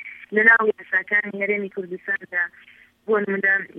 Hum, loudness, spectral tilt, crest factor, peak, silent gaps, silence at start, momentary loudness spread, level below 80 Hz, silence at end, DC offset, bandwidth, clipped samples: none; -20 LUFS; -7.5 dB/octave; 20 dB; -2 dBFS; none; 0 s; 14 LU; -76 dBFS; 0 s; under 0.1%; 5.8 kHz; under 0.1%